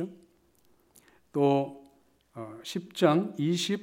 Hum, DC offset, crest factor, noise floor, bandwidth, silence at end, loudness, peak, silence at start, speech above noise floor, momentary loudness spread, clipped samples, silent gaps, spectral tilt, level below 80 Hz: none; under 0.1%; 24 dB; -66 dBFS; 16 kHz; 0 s; -28 LUFS; -8 dBFS; 0 s; 39 dB; 18 LU; under 0.1%; none; -6 dB/octave; -78 dBFS